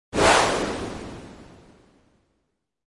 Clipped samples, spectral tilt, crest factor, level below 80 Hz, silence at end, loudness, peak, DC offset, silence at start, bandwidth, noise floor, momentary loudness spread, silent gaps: under 0.1%; -3 dB/octave; 22 dB; -46 dBFS; 1.5 s; -21 LUFS; -4 dBFS; under 0.1%; 0.15 s; 11.5 kHz; -76 dBFS; 24 LU; none